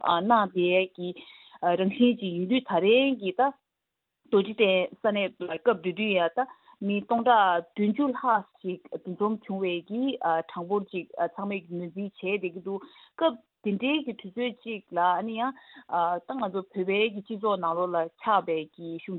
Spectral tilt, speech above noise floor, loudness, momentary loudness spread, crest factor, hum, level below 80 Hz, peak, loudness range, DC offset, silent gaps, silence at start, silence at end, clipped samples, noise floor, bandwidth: -9.5 dB/octave; 57 dB; -27 LUFS; 13 LU; 20 dB; none; -76 dBFS; -8 dBFS; 6 LU; under 0.1%; none; 0 s; 0 s; under 0.1%; -84 dBFS; 4.3 kHz